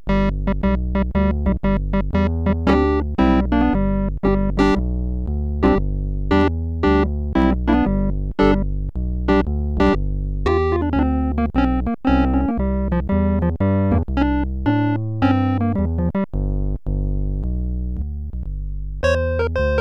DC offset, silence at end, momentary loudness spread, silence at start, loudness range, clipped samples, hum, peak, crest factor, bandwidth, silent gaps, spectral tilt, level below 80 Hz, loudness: 1%; 0 s; 7 LU; 0.05 s; 3 LU; under 0.1%; none; -6 dBFS; 12 dB; 7.4 kHz; none; -8.5 dB/octave; -24 dBFS; -20 LUFS